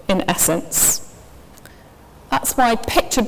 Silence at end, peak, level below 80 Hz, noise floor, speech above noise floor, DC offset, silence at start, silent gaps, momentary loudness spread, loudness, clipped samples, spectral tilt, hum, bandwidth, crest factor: 0 s; 0 dBFS; -40 dBFS; -44 dBFS; 27 dB; under 0.1%; 0.1 s; none; 7 LU; -17 LUFS; under 0.1%; -2.5 dB/octave; none; 16 kHz; 20 dB